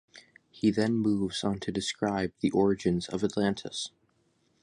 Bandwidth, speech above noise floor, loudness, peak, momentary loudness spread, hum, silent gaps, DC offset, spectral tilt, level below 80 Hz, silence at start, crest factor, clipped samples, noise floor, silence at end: 11 kHz; 42 dB; -29 LUFS; -12 dBFS; 7 LU; none; none; under 0.1%; -5.5 dB/octave; -58 dBFS; 0.15 s; 18 dB; under 0.1%; -70 dBFS; 0.75 s